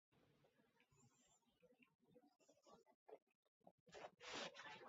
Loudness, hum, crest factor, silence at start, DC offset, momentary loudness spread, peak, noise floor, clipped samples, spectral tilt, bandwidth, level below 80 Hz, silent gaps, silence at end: -56 LUFS; none; 24 dB; 0.1 s; under 0.1%; 15 LU; -40 dBFS; -81 dBFS; under 0.1%; -0.5 dB/octave; 7.6 kHz; under -90 dBFS; 1.95-1.99 s, 2.94-3.06 s, 3.22-3.27 s, 3.35-3.61 s, 3.71-3.86 s; 0 s